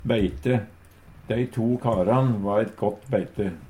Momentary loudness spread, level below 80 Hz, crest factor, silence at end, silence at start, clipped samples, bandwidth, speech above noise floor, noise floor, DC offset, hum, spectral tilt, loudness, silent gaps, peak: 7 LU; -46 dBFS; 16 dB; 0 s; 0 s; under 0.1%; 11 kHz; 25 dB; -49 dBFS; under 0.1%; none; -8.5 dB/octave; -25 LUFS; none; -8 dBFS